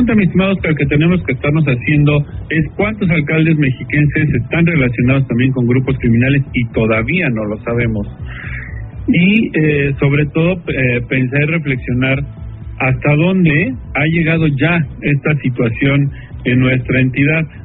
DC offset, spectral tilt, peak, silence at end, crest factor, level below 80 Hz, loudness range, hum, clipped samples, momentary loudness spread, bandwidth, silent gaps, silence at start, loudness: under 0.1%; -6.5 dB/octave; 0 dBFS; 0 s; 14 dB; -32 dBFS; 2 LU; none; under 0.1%; 6 LU; 4 kHz; none; 0 s; -14 LUFS